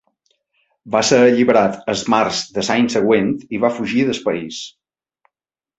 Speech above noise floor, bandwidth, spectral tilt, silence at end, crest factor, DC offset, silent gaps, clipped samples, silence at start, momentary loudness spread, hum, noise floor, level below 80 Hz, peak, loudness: 71 dB; 8.2 kHz; -4.5 dB/octave; 1.1 s; 16 dB; under 0.1%; none; under 0.1%; 0.85 s; 10 LU; none; -87 dBFS; -56 dBFS; -2 dBFS; -16 LUFS